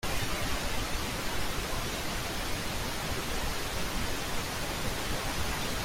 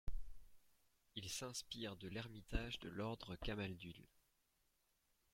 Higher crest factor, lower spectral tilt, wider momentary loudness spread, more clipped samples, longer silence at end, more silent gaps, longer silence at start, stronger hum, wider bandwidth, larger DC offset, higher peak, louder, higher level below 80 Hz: second, 14 dB vs 24 dB; about the same, -3 dB/octave vs -4 dB/octave; second, 1 LU vs 10 LU; neither; second, 0 s vs 1.25 s; neither; about the same, 0.05 s vs 0.05 s; neither; about the same, 16.5 kHz vs 16.5 kHz; neither; first, -18 dBFS vs -26 dBFS; first, -33 LUFS vs -49 LUFS; first, -40 dBFS vs -56 dBFS